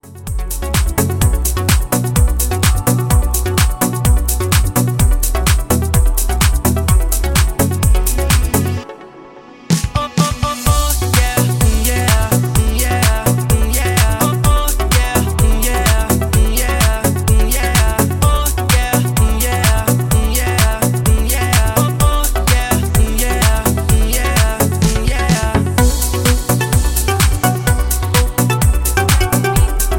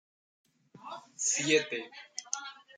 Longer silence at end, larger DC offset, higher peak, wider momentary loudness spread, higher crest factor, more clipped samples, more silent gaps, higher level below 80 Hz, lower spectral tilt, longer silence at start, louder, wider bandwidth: second, 0 s vs 0.25 s; neither; first, 0 dBFS vs -12 dBFS; second, 2 LU vs 20 LU; second, 14 dB vs 22 dB; neither; neither; first, -16 dBFS vs -84 dBFS; first, -4.5 dB/octave vs -1.5 dB/octave; second, 0.05 s vs 0.8 s; first, -14 LUFS vs -31 LUFS; first, 17 kHz vs 10 kHz